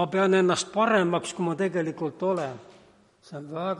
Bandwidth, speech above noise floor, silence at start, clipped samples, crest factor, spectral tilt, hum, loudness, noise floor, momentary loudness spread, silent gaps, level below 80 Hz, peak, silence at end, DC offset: 11.5 kHz; 31 dB; 0 s; under 0.1%; 16 dB; -5 dB/octave; none; -25 LUFS; -57 dBFS; 16 LU; none; -70 dBFS; -10 dBFS; 0 s; under 0.1%